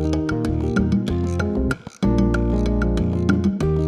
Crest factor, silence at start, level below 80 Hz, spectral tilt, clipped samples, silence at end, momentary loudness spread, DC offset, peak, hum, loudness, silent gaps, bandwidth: 14 dB; 0 s; -28 dBFS; -8 dB/octave; under 0.1%; 0 s; 3 LU; under 0.1%; -4 dBFS; none; -21 LUFS; none; 12 kHz